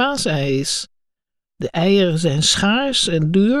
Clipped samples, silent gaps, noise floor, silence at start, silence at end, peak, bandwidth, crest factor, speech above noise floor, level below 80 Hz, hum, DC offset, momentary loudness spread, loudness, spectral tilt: under 0.1%; none; -79 dBFS; 0 s; 0 s; -2 dBFS; 13 kHz; 16 dB; 62 dB; -46 dBFS; none; under 0.1%; 9 LU; -17 LUFS; -4 dB/octave